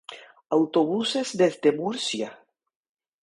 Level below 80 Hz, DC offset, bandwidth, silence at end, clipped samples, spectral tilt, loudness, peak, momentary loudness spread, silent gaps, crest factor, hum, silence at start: -74 dBFS; under 0.1%; 11.5 kHz; 0.85 s; under 0.1%; -4.5 dB/octave; -24 LUFS; -8 dBFS; 10 LU; none; 18 dB; none; 0.1 s